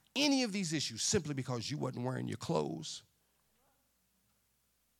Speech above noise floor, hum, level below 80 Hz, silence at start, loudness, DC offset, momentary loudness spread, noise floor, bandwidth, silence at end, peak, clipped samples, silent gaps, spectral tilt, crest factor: 41 dB; none; -72 dBFS; 0.15 s; -35 LUFS; under 0.1%; 10 LU; -77 dBFS; 16.5 kHz; 2 s; -18 dBFS; under 0.1%; none; -4 dB/octave; 20 dB